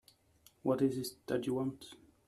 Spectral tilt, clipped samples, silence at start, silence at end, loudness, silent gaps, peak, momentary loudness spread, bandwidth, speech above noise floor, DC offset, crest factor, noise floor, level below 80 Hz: -6 dB/octave; under 0.1%; 0.65 s; 0.35 s; -36 LUFS; none; -20 dBFS; 14 LU; 14.5 kHz; 32 dB; under 0.1%; 18 dB; -67 dBFS; -72 dBFS